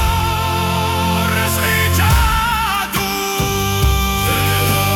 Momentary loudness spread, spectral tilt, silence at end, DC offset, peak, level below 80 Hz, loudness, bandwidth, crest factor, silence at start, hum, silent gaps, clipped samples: 4 LU; -4 dB/octave; 0 s; under 0.1%; -2 dBFS; -24 dBFS; -16 LUFS; 18 kHz; 12 dB; 0 s; none; none; under 0.1%